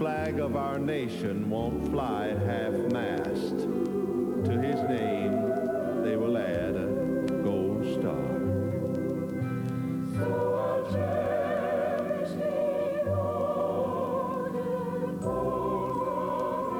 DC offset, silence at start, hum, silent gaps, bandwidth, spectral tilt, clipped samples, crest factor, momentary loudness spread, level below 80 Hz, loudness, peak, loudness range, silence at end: under 0.1%; 0 s; none; none; 19.5 kHz; -8 dB/octave; under 0.1%; 12 dB; 3 LU; -54 dBFS; -29 LUFS; -16 dBFS; 1 LU; 0 s